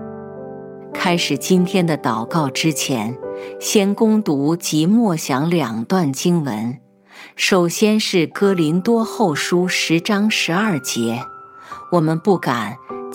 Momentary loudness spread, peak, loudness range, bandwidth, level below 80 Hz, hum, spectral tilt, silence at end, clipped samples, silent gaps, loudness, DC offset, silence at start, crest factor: 15 LU; -2 dBFS; 2 LU; 17 kHz; -66 dBFS; none; -5 dB/octave; 0 s; under 0.1%; none; -18 LUFS; under 0.1%; 0 s; 16 dB